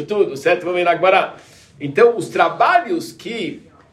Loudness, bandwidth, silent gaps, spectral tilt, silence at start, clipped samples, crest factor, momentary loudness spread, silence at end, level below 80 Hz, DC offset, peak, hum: -17 LUFS; 13.5 kHz; none; -5 dB/octave; 0 s; under 0.1%; 16 dB; 13 LU; 0.35 s; -64 dBFS; under 0.1%; -2 dBFS; none